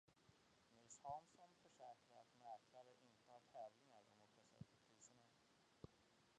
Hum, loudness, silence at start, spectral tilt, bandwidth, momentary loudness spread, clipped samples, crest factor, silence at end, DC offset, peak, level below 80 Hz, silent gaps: none; -63 LUFS; 0.05 s; -4 dB/octave; 9.4 kHz; 12 LU; under 0.1%; 22 dB; 0 s; under 0.1%; -42 dBFS; -88 dBFS; none